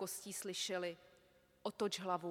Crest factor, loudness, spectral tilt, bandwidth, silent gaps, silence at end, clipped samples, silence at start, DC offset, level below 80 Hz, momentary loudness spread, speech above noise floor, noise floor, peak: 18 dB; -42 LUFS; -3 dB/octave; 18 kHz; none; 0 s; under 0.1%; 0 s; under 0.1%; -84 dBFS; 8 LU; 28 dB; -71 dBFS; -26 dBFS